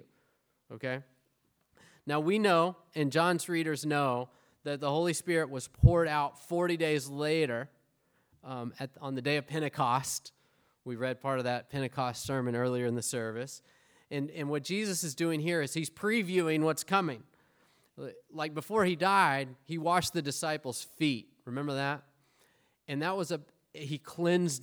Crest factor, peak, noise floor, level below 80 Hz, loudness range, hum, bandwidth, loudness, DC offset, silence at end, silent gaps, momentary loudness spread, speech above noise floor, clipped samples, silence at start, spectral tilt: 24 dB; -8 dBFS; -75 dBFS; -50 dBFS; 5 LU; none; over 20 kHz; -32 LUFS; under 0.1%; 0 s; none; 14 LU; 44 dB; under 0.1%; 0.7 s; -5 dB/octave